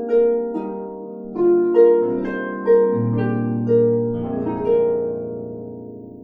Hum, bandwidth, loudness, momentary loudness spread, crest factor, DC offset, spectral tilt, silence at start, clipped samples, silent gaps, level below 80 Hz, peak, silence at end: none; 3.5 kHz; -19 LUFS; 17 LU; 16 dB; under 0.1%; -11.5 dB/octave; 0 s; under 0.1%; none; -52 dBFS; -2 dBFS; 0 s